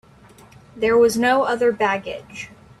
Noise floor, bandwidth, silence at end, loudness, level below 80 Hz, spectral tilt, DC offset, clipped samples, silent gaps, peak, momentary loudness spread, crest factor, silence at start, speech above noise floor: -48 dBFS; 13 kHz; 0.35 s; -18 LUFS; -54 dBFS; -4 dB/octave; under 0.1%; under 0.1%; none; -6 dBFS; 19 LU; 16 dB; 0.75 s; 29 dB